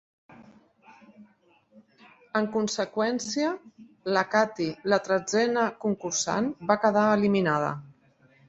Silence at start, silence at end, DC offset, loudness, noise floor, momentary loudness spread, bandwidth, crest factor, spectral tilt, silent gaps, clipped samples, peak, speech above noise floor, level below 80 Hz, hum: 0.4 s; 0.6 s; under 0.1%; -26 LUFS; -63 dBFS; 8 LU; 8.2 kHz; 22 dB; -4.5 dB/octave; none; under 0.1%; -6 dBFS; 37 dB; -68 dBFS; none